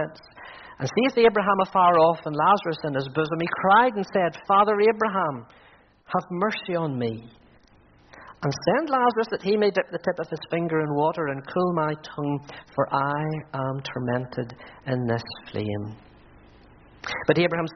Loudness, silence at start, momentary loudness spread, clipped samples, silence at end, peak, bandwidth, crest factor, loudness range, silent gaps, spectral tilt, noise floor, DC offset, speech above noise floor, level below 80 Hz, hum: -24 LUFS; 0 s; 14 LU; under 0.1%; 0 s; -4 dBFS; 6.4 kHz; 20 dB; 9 LU; none; -4.5 dB/octave; -56 dBFS; under 0.1%; 32 dB; -60 dBFS; none